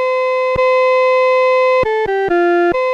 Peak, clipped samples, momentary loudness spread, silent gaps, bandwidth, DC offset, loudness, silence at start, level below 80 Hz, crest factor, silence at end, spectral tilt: -6 dBFS; under 0.1%; 3 LU; none; 7.6 kHz; under 0.1%; -13 LUFS; 0 s; -44 dBFS; 6 dB; 0 s; -5.5 dB/octave